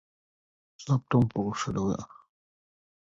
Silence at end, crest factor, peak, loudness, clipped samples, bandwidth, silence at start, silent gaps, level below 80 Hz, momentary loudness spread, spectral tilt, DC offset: 1.05 s; 20 dB; -10 dBFS; -29 LUFS; under 0.1%; 7.8 kHz; 0.8 s; none; -56 dBFS; 16 LU; -7 dB/octave; under 0.1%